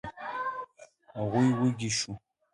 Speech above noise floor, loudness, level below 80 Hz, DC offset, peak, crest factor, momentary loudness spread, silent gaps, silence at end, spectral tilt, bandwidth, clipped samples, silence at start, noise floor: 28 dB; -30 LUFS; -62 dBFS; under 0.1%; -14 dBFS; 16 dB; 19 LU; none; 0.35 s; -5 dB/octave; 11.5 kHz; under 0.1%; 0.05 s; -56 dBFS